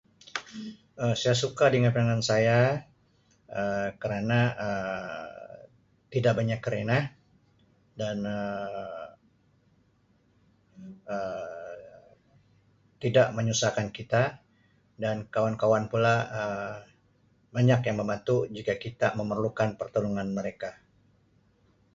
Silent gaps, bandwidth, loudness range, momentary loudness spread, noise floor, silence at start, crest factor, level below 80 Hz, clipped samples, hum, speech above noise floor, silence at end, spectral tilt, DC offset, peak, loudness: none; 7.8 kHz; 12 LU; 16 LU; -66 dBFS; 0.35 s; 20 dB; -62 dBFS; under 0.1%; none; 39 dB; 1.2 s; -5.5 dB/octave; under 0.1%; -8 dBFS; -28 LUFS